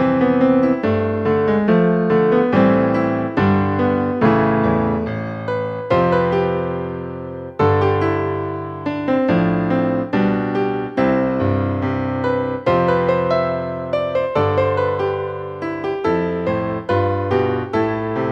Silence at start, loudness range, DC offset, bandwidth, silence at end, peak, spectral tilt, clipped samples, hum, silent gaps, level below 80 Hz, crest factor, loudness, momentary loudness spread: 0 s; 4 LU; under 0.1%; 6.8 kHz; 0 s; -2 dBFS; -9 dB/octave; under 0.1%; none; none; -46 dBFS; 16 dB; -18 LUFS; 9 LU